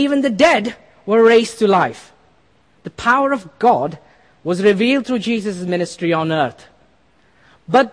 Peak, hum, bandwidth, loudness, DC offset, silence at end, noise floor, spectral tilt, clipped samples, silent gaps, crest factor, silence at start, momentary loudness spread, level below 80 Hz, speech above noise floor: -2 dBFS; none; 10.5 kHz; -16 LUFS; under 0.1%; 0.05 s; -56 dBFS; -5.5 dB/octave; under 0.1%; none; 16 dB; 0 s; 11 LU; -56 dBFS; 40 dB